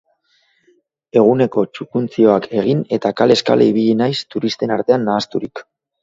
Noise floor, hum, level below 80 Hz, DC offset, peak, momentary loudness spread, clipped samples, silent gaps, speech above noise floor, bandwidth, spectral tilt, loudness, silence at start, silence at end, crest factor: -61 dBFS; none; -60 dBFS; under 0.1%; 0 dBFS; 9 LU; under 0.1%; none; 45 dB; 7.8 kHz; -6.5 dB/octave; -16 LUFS; 1.15 s; 0.4 s; 16 dB